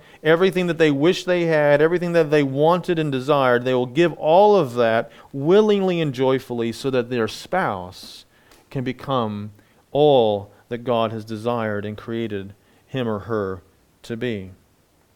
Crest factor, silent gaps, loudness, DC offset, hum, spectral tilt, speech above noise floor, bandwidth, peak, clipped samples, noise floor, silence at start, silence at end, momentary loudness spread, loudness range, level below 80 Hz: 18 dB; none; -20 LUFS; under 0.1%; none; -6.5 dB/octave; 40 dB; 16.5 kHz; -2 dBFS; under 0.1%; -59 dBFS; 0.25 s; 0.65 s; 15 LU; 8 LU; -58 dBFS